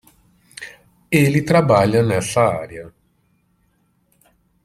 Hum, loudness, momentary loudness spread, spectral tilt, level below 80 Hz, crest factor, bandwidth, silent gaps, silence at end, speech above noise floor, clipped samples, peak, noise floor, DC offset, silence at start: none; -16 LUFS; 21 LU; -6 dB/octave; -52 dBFS; 18 dB; 15.5 kHz; none; 1.75 s; 47 dB; under 0.1%; -2 dBFS; -63 dBFS; under 0.1%; 0.6 s